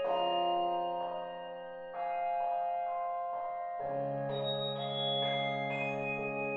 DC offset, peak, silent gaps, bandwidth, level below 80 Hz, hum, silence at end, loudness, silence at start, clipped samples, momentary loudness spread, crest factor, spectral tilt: under 0.1%; -22 dBFS; none; 6.6 kHz; -72 dBFS; none; 0 s; -35 LUFS; 0 s; under 0.1%; 8 LU; 14 dB; -2.5 dB/octave